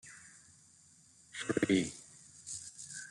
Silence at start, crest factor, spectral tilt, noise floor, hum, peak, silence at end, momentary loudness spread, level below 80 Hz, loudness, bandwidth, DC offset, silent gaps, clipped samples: 0.05 s; 24 dB; -4 dB/octave; -63 dBFS; none; -16 dBFS; 0 s; 23 LU; -72 dBFS; -36 LUFS; 12 kHz; under 0.1%; none; under 0.1%